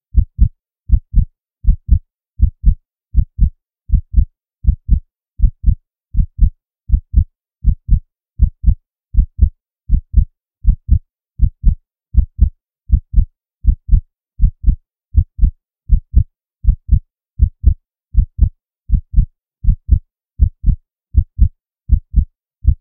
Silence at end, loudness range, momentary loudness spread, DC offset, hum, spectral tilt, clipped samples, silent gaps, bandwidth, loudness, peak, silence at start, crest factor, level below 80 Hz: 0.05 s; 1 LU; 6 LU; under 0.1%; none; -15.5 dB/octave; 0.2%; none; 0.6 kHz; -19 LUFS; 0 dBFS; 0.15 s; 14 dB; -16 dBFS